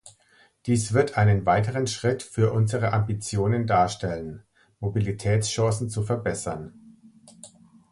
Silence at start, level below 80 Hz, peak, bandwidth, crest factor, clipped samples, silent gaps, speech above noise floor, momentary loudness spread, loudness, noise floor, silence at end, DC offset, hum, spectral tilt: 0.05 s; -48 dBFS; -8 dBFS; 11.5 kHz; 18 dB; under 0.1%; none; 36 dB; 12 LU; -25 LUFS; -60 dBFS; 0.45 s; under 0.1%; none; -6 dB/octave